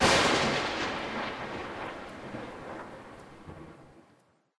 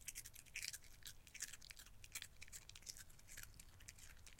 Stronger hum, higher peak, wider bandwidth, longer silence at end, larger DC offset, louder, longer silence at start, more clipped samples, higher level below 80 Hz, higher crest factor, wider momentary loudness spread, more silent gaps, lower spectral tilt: neither; first, -10 dBFS vs -26 dBFS; second, 11 kHz vs 16.5 kHz; first, 0.6 s vs 0 s; neither; first, -31 LUFS vs -54 LUFS; about the same, 0 s vs 0 s; neither; first, -54 dBFS vs -66 dBFS; second, 22 dB vs 32 dB; first, 23 LU vs 10 LU; neither; first, -3 dB/octave vs 0 dB/octave